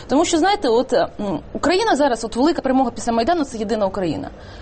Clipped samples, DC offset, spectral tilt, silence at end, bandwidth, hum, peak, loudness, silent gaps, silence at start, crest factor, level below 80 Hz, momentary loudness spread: under 0.1%; under 0.1%; -4.5 dB/octave; 0 s; 8.8 kHz; none; -6 dBFS; -19 LUFS; none; 0 s; 12 dB; -42 dBFS; 8 LU